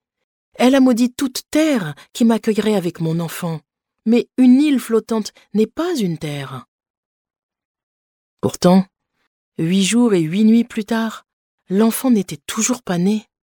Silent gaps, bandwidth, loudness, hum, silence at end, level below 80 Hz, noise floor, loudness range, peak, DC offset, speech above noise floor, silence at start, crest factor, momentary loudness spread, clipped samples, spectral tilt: 6.68-6.79 s, 6.90-7.25 s, 7.43-7.49 s, 7.65-7.75 s, 7.83-8.37 s, 9.27-9.52 s, 11.33-11.58 s; 19 kHz; -17 LUFS; none; 0.3 s; -58 dBFS; under -90 dBFS; 5 LU; -2 dBFS; under 0.1%; over 73 dB; 0.6 s; 16 dB; 12 LU; under 0.1%; -5.5 dB/octave